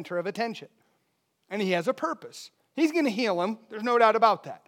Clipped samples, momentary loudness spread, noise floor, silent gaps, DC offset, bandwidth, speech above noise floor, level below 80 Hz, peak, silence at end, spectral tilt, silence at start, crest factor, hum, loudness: under 0.1%; 17 LU; -74 dBFS; none; under 0.1%; 16.5 kHz; 48 dB; under -90 dBFS; -8 dBFS; 0.1 s; -5 dB/octave; 0 s; 20 dB; none; -26 LUFS